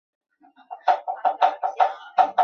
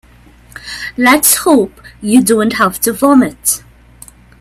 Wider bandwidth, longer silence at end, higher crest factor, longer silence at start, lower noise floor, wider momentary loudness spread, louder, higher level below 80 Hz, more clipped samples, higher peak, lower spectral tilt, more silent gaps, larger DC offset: second, 6.6 kHz vs 16.5 kHz; second, 0 s vs 0.85 s; first, 18 dB vs 12 dB; first, 0.7 s vs 0.55 s; about the same, -43 dBFS vs -42 dBFS; second, 5 LU vs 15 LU; second, -23 LUFS vs -11 LUFS; second, -88 dBFS vs -44 dBFS; neither; second, -4 dBFS vs 0 dBFS; about the same, -2.5 dB/octave vs -3 dB/octave; neither; neither